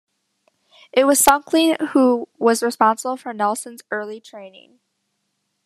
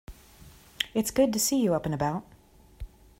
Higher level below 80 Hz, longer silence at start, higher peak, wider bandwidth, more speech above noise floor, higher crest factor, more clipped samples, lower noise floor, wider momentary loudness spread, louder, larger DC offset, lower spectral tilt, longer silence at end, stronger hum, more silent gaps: second, -56 dBFS vs -50 dBFS; first, 0.95 s vs 0.1 s; first, 0 dBFS vs -6 dBFS; second, 14 kHz vs 16 kHz; first, 54 dB vs 30 dB; about the same, 20 dB vs 22 dB; neither; first, -73 dBFS vs -56 dBFS; second, 14 LU vs 24 LU; first, -18 LUFS vs -27 LUFS; neither; second, -2.5 dB/octave vs -4 dB/octave; first, 1.15 s vs 0.35 s; neither; neither